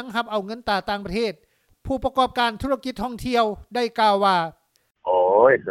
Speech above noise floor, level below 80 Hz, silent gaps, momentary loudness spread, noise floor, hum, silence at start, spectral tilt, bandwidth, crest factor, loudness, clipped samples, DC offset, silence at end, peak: 19 dB; -48 dBFS; none; 12 LU; -41 dBFS; none; 0 s; -5 dB/octave; 14 kHz; 20 dB; -22 LUFS; under 0.1%; under 0.1%; 0 s; -2 dBFS